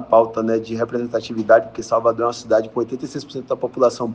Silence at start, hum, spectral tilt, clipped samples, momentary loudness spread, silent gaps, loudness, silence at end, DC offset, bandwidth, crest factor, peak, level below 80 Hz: 0 s; none; -5.5 dB/octave; under 0.1%; 10 LU; none; -20 LUFS; 0 s; under 0.1%; 9 kHz; 18 dB; 0 dBFS; -58 dBFS